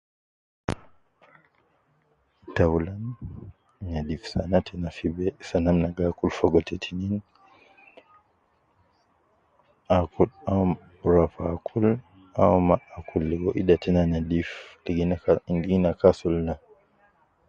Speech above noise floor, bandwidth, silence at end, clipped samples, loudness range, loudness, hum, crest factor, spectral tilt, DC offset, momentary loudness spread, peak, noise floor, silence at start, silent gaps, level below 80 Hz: 43 dB; 7.6 kHz; 0.9 s; under 0.1%; 8 LU; -25 LUFS; none; 22 dB; -8.5 dB/octave; under 0.1%; 13 LU; -4 dBFS; -67 dBFS; 0.7 s; none; -42 dBFS